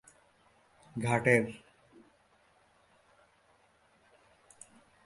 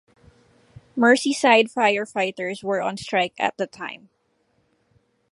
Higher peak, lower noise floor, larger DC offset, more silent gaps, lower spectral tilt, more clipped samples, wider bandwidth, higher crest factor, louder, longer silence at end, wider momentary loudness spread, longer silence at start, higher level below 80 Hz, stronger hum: second, -10 dBFS vs -2 dBFS; about the same, -67 dBFS vs -67 dBFS; neither; neither; first, -6 dB/octave vs -3.5 dB/octave; neither; about the same, 11.5 kHz vs 11.5 kHz; first, 28 dB vs 22 dB; second, -30 LUFS vs -21 LUFS; first, 3.5 s vs 1.35 s; first, 29 LU vs 16 LU; about the same, 0.95 s vs 0.95 s; about the same, -70 dBFS vs -66 dBFS; neither